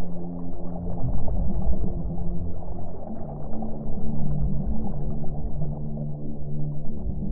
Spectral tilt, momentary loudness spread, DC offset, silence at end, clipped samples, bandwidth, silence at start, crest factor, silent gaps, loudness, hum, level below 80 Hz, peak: -15.5 dB/octave; 7 LU; under 0.1%; 0 s; under 0.1%; 1.4 kHz; 0 s; 12 dB; none; -32 LUFS; none; -32 dBFS; -8 dBFS